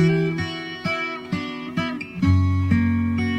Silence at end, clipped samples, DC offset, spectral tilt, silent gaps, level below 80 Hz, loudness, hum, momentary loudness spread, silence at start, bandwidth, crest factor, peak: 0 s; under 0.1%; under 0.1%; -7.5 dB/octave; none; -44 dBFS; -23 LUFS; none; 8 LU; 0 s; 8.2 kHz; 16 dB; -6 dBFS